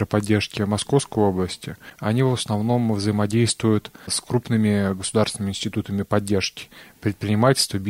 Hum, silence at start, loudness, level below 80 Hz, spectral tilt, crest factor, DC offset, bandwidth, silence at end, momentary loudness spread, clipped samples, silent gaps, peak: none; 0 s; -22 LUFS; -54 dBFS; -5 dB/octave; 18 dB; under 0.1%; 16 kHz; 0 s; 8 LU; under 0.1%; none; -4 dBFS